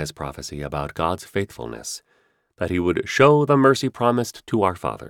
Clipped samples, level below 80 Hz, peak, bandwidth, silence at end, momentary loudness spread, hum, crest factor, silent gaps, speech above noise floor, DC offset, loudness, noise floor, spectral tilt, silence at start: under 0.1%; -48 dBFS; -4 dBFS; 17 kHz; 0 s; 16 LU; none; 18 dB; none; 43 dB; under 0.1%; -21 LUFS; -64 dBFS; -5.5 dB/octave; 0 s